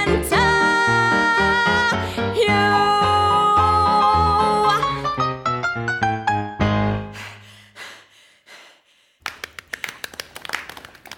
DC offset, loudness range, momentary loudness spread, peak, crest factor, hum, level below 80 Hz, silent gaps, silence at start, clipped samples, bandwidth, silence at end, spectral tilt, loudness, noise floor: under 0.1%; 17 LU; 18 LU; -4 dBFS; 16 dB; none; -40 dBFS; none; 0 s; under 0.1%; 18 kHz; 0.05 s; -4.5 dB/octave; -18 LUFS; -58 dBFS